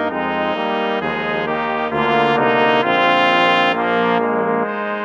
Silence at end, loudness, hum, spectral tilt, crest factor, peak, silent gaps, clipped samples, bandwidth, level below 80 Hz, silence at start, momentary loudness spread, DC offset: 0 s; -17 LUFS; none; -6 dB/octave; 16 dB; -2 dBFS; none; under 0.1%; 8.2 kHz; -54 dBFS; 0 s; 7 LU; under 0.1%